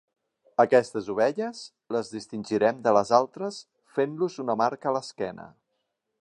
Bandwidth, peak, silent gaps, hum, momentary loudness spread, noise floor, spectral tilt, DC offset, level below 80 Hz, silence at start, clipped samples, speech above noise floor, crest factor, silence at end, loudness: 11 kHz; -6 dBFS; none; none; 14 LU; -79 dBFS; -5.5 dB/octave; under 0.1%; -72 dBFS; 0.6 s; under 0.1%; 53 dB; 22 dB; 0.75 s; -26 LUFS